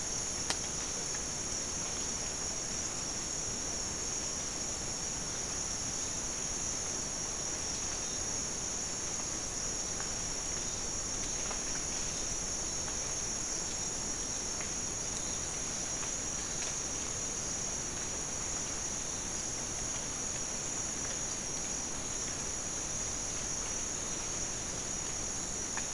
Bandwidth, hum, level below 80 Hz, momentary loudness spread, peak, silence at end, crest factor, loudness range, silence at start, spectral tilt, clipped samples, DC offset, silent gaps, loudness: 12 kHz; none; -50 dBFS; 1 LU; -10 dBFS; 0 s; 26 dB; 1 LU; 0 s; -1.5 dB/octave; under 0.1%; 0.2%; none; -34 LUFS